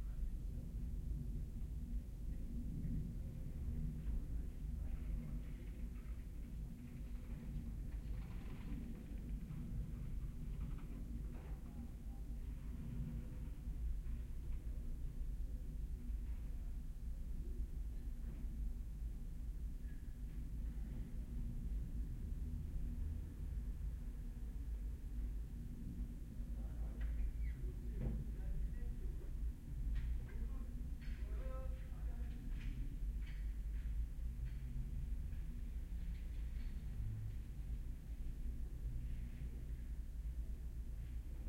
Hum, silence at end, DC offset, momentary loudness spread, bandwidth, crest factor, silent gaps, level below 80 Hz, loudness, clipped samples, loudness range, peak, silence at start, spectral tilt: none; 0 s; under 0.1%; 4 LU; 15.5 kHz; 16 dB; none; -44 dBFS; -49 LUFS; under 0.1%; 3 LU; -30 dBFS; 0 s; -8 dB/octave